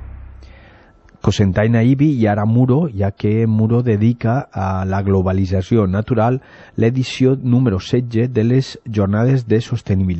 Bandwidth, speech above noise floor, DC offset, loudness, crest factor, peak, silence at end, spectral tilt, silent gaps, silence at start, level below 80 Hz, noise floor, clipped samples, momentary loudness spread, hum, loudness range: 8.2 kHz; 31 dB; under 0.1%; -16 LUFS; 14 dB; -2 dBFS; 0 s; -8 dB/octave; none; 0 s; -42 dBFS; -47 dBFS; under 0.1%; 6 LU; none; 2 LU